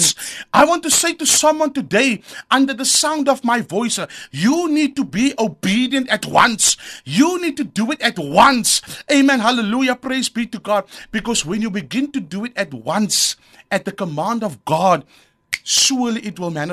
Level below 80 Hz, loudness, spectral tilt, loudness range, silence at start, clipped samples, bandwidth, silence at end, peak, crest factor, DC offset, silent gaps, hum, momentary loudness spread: -54 dBFS; -17 LUFS; -2.5 dB/octave; 5 LU; 0 s; under 0.1%; 13.5 kHz; 0 s; 0 dBFS; 18 dB; under 0.1%; none; none; 11 LU